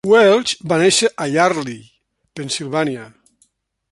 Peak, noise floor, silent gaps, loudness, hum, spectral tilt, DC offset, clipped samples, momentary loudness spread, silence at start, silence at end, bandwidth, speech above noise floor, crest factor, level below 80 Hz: -2 dBFS; -61 dBFS; none; -16 LUFS; none; -3.5 dB/octave; under 0.1%; under 0.1%; 19 LU; 0.05 s; 0.85 s; 11.5 kHz; 45 dB; 16 dB; -60 dBFS